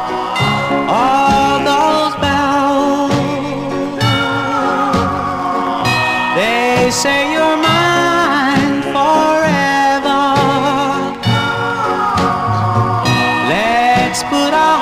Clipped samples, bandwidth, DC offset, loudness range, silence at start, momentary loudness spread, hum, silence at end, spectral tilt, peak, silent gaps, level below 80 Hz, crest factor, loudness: under 0.1%; 16 kHz; 0.1%; 3 LU; 0 s; 5 LU; none; 0 s; -4.5 dB/octave; -2 dBFS; none; -40 dBFS; 12 dB; -13 LUFS